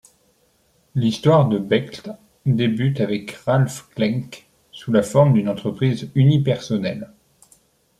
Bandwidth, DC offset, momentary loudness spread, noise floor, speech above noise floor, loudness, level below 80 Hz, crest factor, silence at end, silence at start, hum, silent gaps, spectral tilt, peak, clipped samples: 12.5 kHz; under 0.1%; 16 LU; -61 dBFS; 43 dB; -20 LUFS; -58 dBFS; 18 dB; 0.95 s; 0.95 s; none; none; -7.5 dB/octave; -2 dBFS; under 0.1%